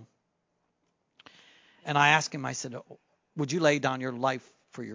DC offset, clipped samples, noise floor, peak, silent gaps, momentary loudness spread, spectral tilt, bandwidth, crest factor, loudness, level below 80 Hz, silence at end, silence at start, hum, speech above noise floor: under 0.1%; under 0.1%; -77 dBFS; -6 dBFS; none; 21 LU; -4 dB/octave; 7.6 kHz; 26 dB; -27 LUFS; -78 dBFS; 0 s; 0 s; none; 49 dB